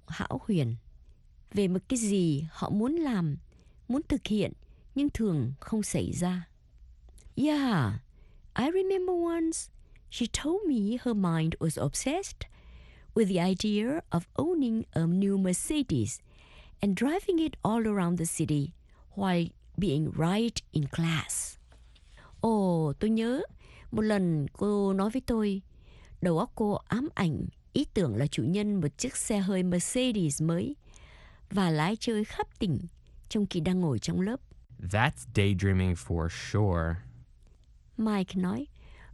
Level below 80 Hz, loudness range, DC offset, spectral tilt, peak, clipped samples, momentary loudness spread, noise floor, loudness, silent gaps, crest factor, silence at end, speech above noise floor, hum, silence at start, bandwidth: -50 dBFS; 2 LU; under 0.1%; -6 dB/octave; -8 dBFS; under 0.1%; 8 LU; -57 dBFS; -30 LUFS; none; 22 dB; 0 s; 28 dB; none; 0.1 s; 12.5 kHz